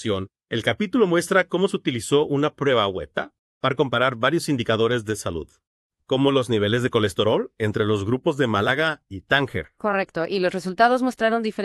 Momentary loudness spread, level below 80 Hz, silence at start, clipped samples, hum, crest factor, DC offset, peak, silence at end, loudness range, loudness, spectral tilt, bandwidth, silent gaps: 8 LU; -54 dBFS; 0 s; under 0.1%; none; 20 dB; under 0.1%; -2 dBFS; 0 s; 1 LU; -22 LUFS; -5.5 dB/octave; 13 kHz; 3.39-3.61 s, 5.67-5.90 s